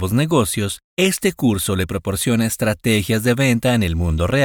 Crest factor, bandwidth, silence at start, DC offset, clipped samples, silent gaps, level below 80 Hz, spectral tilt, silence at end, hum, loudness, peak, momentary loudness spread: 14 dB; over 20 kHz; 0 s; under 0.1%; under 0.1%; 0.84-0.97 s; -34 dBFS; -5 dB/octave; 0 s; none; -18 LUFS; -4 dBFS; 5 LU